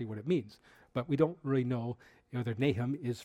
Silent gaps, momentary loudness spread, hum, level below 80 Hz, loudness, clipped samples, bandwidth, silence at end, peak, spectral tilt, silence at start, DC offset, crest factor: none; 11 LU; none; -66 dBFS; -34 LUFS; under 0.1%; 11 kHz; 0 s; -14 dBFS; -8 dB/octave; 0 s; under 0.1%; 20 dB